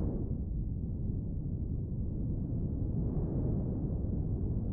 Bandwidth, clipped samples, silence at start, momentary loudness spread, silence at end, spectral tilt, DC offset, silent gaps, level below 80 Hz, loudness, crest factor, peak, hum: 1.8 kHz; under 0.1%; 0 s; 3 LU; 0 s; -15 dB/octave; under 0.1%; none; -38 dBFS; -36 LUFS; 12 dB; -22 dBFS; none